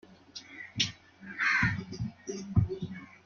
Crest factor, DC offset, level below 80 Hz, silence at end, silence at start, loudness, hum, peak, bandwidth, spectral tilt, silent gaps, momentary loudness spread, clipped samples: 22 dB; under 0.1%; -50 dBFS; 0.1 s; 0.1 s; -31 LUFS; none; -12 dBFS; 7.2 kHz; -4.5 dB/octave; none; 19 LU; under 0.1%